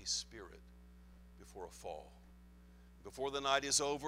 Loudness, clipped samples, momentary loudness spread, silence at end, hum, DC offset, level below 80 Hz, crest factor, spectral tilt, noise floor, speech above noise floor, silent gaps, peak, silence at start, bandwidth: -37 LUFS; under 0.1%; 26 LU; 0 s; none; under 0.1%; -62 dBFS; 24 dB; -1.5 dB/octave; -60 dBFS; 20 dB; none; -18 dBFS; 0 s; 16 kHz